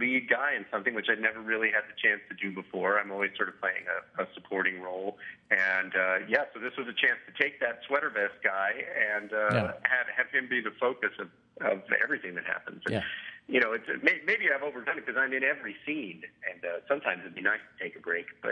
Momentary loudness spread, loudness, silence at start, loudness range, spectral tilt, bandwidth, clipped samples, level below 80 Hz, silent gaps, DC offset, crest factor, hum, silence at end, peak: 10 LU; -29 LUFS; 0 s; 3 LU; -6 dB/octave; 10.5 kHz; under 0.1%; -76 dBFS; none; under 0.1%; 24 dB; none; 0 s; -6 dBFS